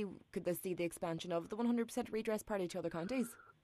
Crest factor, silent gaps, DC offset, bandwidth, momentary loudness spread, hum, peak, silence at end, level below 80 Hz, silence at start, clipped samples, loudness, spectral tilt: 14 dB; none; under 0.1%; 14 kHz; 5 LU; none; -26 dBFS; 0.1 s; -70 dBFS; 0 s; under 0.1%; -40 LUFS; -5.5 dB/octave